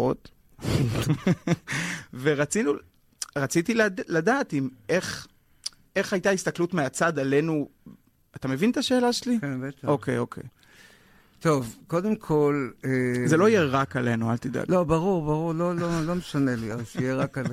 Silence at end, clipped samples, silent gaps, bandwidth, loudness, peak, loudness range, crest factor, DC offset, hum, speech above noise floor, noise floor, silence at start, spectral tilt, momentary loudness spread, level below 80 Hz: 0 s; under 0.1%; none; 16 kHz; -26 LUFS; -10 dBFS; 4 LU; 16 dB; under 0.1%; none; 31 dB; -57 dBFS; 0 s; -5.5 dB/octave; 9 LU; -52 dBFS